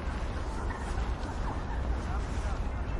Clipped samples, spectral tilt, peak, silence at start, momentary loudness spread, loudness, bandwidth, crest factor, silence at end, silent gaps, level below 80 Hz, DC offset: under 0.1%; -6.5 dB/octave; -20 dBFS; 0 s; 2 LU; -35 LUFS; 11 kHz; 12 dB; 0 s; none; -34 dBFS; under 0.1%